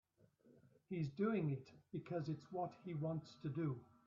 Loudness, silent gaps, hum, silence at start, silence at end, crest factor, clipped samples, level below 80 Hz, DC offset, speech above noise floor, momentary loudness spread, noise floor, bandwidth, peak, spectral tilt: -45 LUFS; none; none; 0.45 s; 0.25 s; 16 dB; under 0.1%; -80 dBFS; under 0.1%; 28 dB; 10 LU; -72 dBFS; 7.4 kHz; -28 dBFS; -8 dB/octave